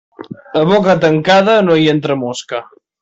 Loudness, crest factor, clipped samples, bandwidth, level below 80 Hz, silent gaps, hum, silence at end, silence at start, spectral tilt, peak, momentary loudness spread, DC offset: -12 LUFS; 12 dB; under 0.1%; 8 kHz; -54 dBFS; none; none; 0.4 s; 0.2 s; -6 dB/octave; -2 dBFS; 15 LU; under 0.1%